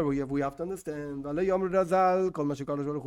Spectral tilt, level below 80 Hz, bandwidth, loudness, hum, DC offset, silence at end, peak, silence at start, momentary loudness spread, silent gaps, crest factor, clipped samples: -7.5 dB/octave; -56 dBFS; 15 kHz; -29 LUFS; none; under 0.1%; 0 s; -14 dBFS; 0 s; 12 LU; none; 14 dB; under 0.1%